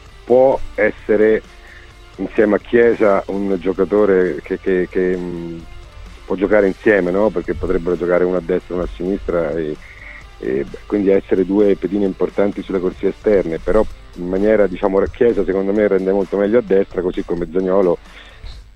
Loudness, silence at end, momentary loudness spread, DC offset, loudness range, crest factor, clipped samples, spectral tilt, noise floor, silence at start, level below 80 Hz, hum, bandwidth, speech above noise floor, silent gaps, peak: -17 LUFS; 0.15 s; 10 LU; under 0.1%; 3 LU; 16 dB; under 0.1%; -8 dB/octave; -39 dBFS; 0.15 s; -36 dBFS; none; 8.8 kHz; 23 dB; none; 0 dBFS